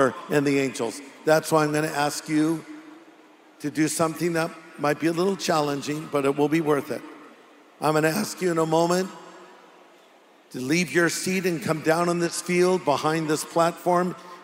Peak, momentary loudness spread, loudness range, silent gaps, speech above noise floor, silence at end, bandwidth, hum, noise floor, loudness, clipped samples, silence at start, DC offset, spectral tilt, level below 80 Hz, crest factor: -6 dBFS; 10 LU; 3 LU; none; 31 dB; 0 s; 16 kHz; none; -54 dBFS; -24 LUFS; under 0.1%; 0 s; under 0.1%; -5 dB/octave; -70 dBFS; 18 dB